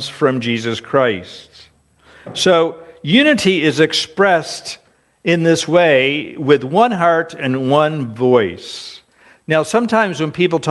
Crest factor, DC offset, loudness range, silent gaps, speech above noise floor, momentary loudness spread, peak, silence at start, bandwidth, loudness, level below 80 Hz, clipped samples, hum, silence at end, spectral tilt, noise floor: 16 dB; under 0.1%; 3 LU; none; 34 dB; 14 LU; 0 dBFS; 0 s; 11.5 kHz; -15 LUFS; -58 dBFS; under 0.1%; none; 0 s; -5 dB/octave; -49 dBFS